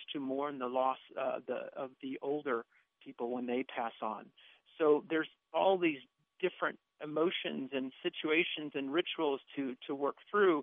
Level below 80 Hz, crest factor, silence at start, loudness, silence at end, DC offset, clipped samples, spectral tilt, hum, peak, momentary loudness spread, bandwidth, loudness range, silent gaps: under -90 dBFS; 20 dB; 0 s; -36 LUFS; 0 s; under 0.1%; under 0.1%; -2.5 dB/octave; none; -16 dBFS; 11 LU; 3.9 kHz; 5 LU; none